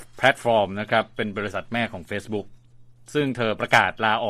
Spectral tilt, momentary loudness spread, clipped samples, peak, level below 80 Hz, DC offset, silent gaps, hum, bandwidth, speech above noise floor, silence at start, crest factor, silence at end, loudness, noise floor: -5 dB/octave; 11 LU; under 0.1%; 0 dBFS; -56 dBFS; under 0.1%; none; none; 14 kHz; 26 dB; 0 s; 22 dB; 0 s; -23 LUFS; -49 dBFS